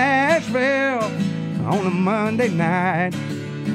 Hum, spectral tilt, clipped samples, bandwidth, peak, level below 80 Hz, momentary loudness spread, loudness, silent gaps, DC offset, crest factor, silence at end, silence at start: none; -6.5 dB/octave; under 0.1%; 14.5 kHz; -6 dBFS; -62 dBFS; 7 LU; -20 LUFS; none; under 0.1%; 14 dB; 0 s; 0 s